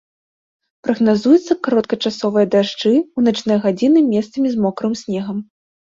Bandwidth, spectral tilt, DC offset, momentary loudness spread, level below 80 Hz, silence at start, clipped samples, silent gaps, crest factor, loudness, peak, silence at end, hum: 7.6 kHz; -6 dB/octave; under 0.1%; 9 LU; -60 dBFS; 0.85 s; under 0.1%; none; 16 dB; -17 LUFS; -2 dBFS; 0.55 s; none